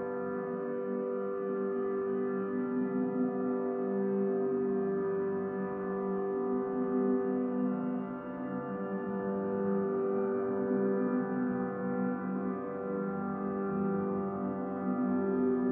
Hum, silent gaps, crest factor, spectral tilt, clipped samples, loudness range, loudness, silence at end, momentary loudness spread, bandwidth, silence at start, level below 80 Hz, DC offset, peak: none; none; 12 dB; -10 dB/octave; under 0.1%; 2 LU; -33 LUFS; 0 s; 5 LU; 3 kHz; 0 s; -72 dBFS; under 0.1%; -20 dBFS